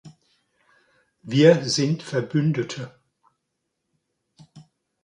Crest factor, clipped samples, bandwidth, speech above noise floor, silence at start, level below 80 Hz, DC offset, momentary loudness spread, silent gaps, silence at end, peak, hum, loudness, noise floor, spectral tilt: 22 dB; under 0.1%; 11 kHz; 58 dB; 0.05 s; -68 dBFS; under 0.1%; 16 LU; none; 0.45 s; -2 dBFS; none; -21 LUFS; -78 dBFS; -5.5 dB/octave